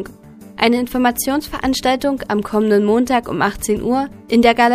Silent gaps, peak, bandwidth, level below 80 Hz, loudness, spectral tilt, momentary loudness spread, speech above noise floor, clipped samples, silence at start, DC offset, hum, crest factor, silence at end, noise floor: none; 0 dBFS; 15.5 kHz; -40 dBFS; -17 LUFS; -4.5 dB/octave; 6 LU; 23 dB; under 0.1%; 0 s; under 0.1%; none; 16 dB; 0 s; -39 dBFS